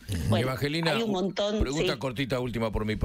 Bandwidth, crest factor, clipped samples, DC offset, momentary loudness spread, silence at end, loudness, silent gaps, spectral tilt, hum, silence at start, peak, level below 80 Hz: 16 kHz; 16 dB; under 0.1%; under 0.1%; 3 LU; 0 s; -28 LUFS; none; -5.5 dB/octave; none; 0 s; -12 dBFS; -40 dBFS